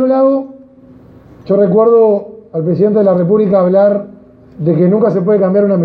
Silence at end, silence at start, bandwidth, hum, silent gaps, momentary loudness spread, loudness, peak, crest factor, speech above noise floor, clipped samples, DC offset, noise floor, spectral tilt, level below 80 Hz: 0 s; 0 s; 4.9 kHz; none; none; 10 LU; -11 LUFS; 0 dBFS; 10 dB; 29 dB; under 0.1%; under 0.1%; -39 dBFS; -12 dB/octave; -54 dBFS